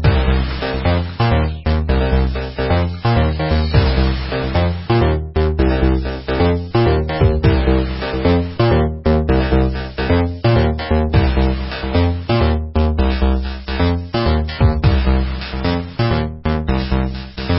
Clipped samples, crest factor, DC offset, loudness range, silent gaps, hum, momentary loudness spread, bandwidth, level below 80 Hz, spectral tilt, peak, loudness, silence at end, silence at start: under 0.1%; 16 dB; under 0.1%; 2 LU; none; none; 5 LU; 5.8 kHz; -20 dBFS; -12 dB/octave; 0 dBFS; -17 LUFS; 0 s; 0 s